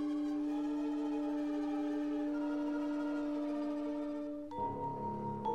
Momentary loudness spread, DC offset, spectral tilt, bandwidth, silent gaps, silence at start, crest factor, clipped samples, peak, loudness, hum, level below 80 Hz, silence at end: 3 LU; under 0.1%; -7.5 dB/octave; 7.6 kHz; none; 0 s; 12 dB; under 0.1%; -26 dBFS; -38 LUFS; none; -66 dBFS; 0 s